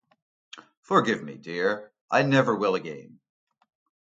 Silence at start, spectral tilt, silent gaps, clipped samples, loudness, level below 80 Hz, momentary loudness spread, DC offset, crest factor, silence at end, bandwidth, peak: 0.55 s; -6 dB/octave; 0.77-0.83 s, 2.01-2.08 s; under 0.1%; -25 LUFS; -72 dBFS; 13 LU; under 0.1%; 22 dB; 1 s; 7.8 kHz; -6 dBFS